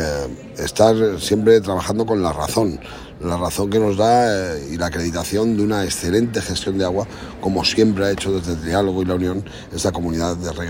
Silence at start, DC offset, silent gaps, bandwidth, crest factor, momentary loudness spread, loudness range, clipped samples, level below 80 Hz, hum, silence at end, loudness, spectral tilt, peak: 0 s; under 0.1%; none; 16.5 kHz; 18 dB; 10 LU; 2 LU; under 0.1%; -40 dBFS; none; 0 s; -19 LUFS; -5 dB/octave; 0 dBFS